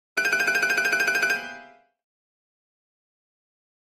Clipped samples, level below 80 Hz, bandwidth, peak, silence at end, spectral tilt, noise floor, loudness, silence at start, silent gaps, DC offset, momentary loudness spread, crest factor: under 0.1%; -70 dBFS; 15.5 kHz; -10 dBFS; 2.2 s; -0.5 dB/octave; -48 dBFS; -22 LUFS; 0.15 s; none; under 0.1%; 6 LU; 18 dB